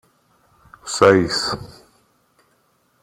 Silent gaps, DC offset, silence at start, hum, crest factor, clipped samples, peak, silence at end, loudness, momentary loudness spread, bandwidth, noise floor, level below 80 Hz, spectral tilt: none; under 0.1%; 0.85 s; none; 20 dB; under 0.1%; -2 dBFS; 1.3 s; -17 LUFS; 17 LU; 15.5 kHz; -63 dBFS; -54 dBFS; -4 dB/octave